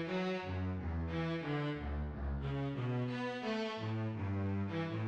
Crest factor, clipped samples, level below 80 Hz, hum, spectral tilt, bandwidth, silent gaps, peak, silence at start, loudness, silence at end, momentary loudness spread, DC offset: 12 dB; under 0.1%; -48 dBFS; none; -8 dB/octave; 8.2 kHz; none; -26 dBFS; 0 s; -39 LUFS; 0 s; 3 LU; under 0.1%